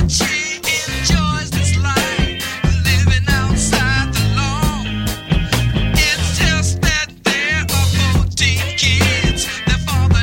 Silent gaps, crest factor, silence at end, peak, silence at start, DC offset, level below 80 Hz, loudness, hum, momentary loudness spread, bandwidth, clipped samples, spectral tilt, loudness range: none; 14 dB; 0 s; -2 dBFS; 0 s; under 0.1%; -24 dBFS; -16 LUFS; none; 4 LU; 17 kHz; under 0.1%; -4 dB/octave; 1 LU